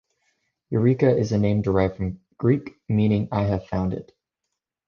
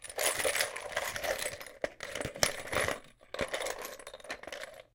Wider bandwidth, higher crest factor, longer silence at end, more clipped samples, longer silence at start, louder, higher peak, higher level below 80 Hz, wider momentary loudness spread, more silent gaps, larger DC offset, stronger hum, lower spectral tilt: second, 6.8 kHz vs 17 kHz; second, 18 dB vs 32 dB; first, 0.85 s vs 0.1 s; neither; first, 0.7 s vs 0 s; first, -23 LUFS vs -35 LUFS; about the same, -6 dBFS vs -6 dBFS; first, -44 dBFS vs -58 dBFS; second, 9 LU vs 14 LU; neither; neither; neither; first, -9 dB/octave vs -1 dB/octave